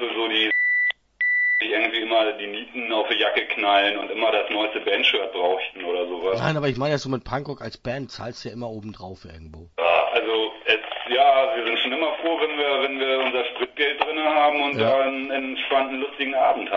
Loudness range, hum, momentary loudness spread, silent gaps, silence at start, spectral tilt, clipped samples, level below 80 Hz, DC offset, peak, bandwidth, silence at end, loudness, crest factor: 6 LU; none; 12 LU; none; 0 s; -5 dB/octave; under 0.1%; -56 dBFS; under 0.1%; -2 dBFS; 7.4 kHz; 0 s; -22 LUFS; 20 dB